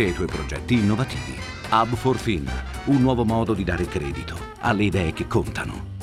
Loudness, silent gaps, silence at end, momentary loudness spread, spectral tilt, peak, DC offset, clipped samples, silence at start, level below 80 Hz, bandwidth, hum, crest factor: -24 LUFS; none; 0 s; 10 LU; -6.5 dB/octave; -6 dBFS; under 0.1%; under 0.1%; 0 s; -36 dBFS; 15 kHz; none; 18 dB